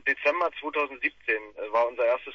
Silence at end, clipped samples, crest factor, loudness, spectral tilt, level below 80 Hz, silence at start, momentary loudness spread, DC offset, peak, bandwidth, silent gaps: 0 s; under 0.1%; 18 dB; -27 LUFS; -3.5 dB/octave; -68 dBFS; 0.05 s; 5 LU; under 0.1%; -10 dBFS; 6.8 kHz; none